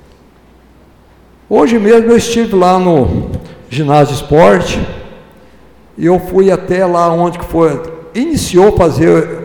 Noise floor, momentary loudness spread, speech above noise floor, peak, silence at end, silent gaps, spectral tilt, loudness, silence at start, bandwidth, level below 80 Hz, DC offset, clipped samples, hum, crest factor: -43 dBFS; 12 LU; 34 dB; 0 dBFS; 0 s; none; -6.5 dB/octave; -10 LUFS; 1.5 s; 19 kHz; -32 dBFS; under 0.1%; 0.1%; none; 10 dB